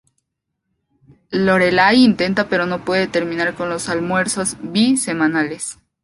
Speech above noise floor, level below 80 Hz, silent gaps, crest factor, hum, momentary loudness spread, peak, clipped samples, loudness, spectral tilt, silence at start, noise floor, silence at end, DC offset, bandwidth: 60 dB; -52 dBFS; none; 16 dB; none; 10 LU; -2 dBFS; under 0.1%; -17 LUFS; -4 dB/octave; 1.3 s; -76 dBFS; 0.3 s; under 0.1%; 11.5 kHz